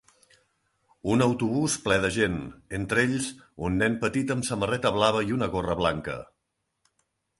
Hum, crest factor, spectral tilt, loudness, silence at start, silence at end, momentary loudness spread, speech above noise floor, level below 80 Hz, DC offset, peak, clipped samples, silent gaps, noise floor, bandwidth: none; 22 dB; -5 dB/octave; -26 LUFS; 1.05 s; 1.15 s; 11 LU; 53 dB; -50 dBFS; under 0.1%; -6 dBFS; under 0.1%; none; -79 dBFS; 11.5 kHz